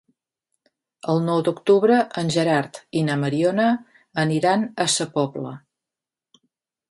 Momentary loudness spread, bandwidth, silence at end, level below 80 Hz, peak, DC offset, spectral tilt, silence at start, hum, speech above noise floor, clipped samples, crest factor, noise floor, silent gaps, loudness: 10 LU; 11.5 kHz; 1.35 s; -66 dBFS; -6 dBFS; under 0.1%; -5 dB/octave; 1.05 s; none; 68 dB; under 0.1%; 18 dB; -89 dBFS; none; -21 LUFS